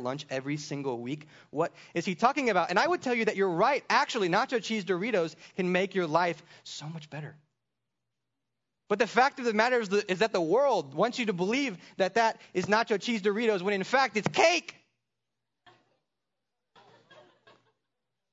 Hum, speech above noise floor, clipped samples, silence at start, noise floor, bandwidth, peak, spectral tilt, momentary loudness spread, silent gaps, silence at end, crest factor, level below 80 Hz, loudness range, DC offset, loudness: none; 58 dB; under 0.1%; 0 s; -87 dBFS; 7.8 kHz; -8 dBFS; -4.5 dB/octave; 13 LU; none; 3.6 s; 22 dB; -78 dBFS; 6 LU; under 0.1%; -28 LUFS